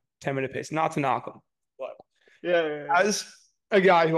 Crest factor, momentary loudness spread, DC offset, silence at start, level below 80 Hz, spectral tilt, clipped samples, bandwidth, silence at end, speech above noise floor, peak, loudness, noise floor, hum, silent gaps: 18 dB; 19 LU; under 0.1%; 0.2 s; -72 dBFS; -4.5 dB/octave; under 0.1%; 12.5 kHz; 0 s; 32 dB; -8 dBFS; -25 LUFS; -56 dBFS; none; none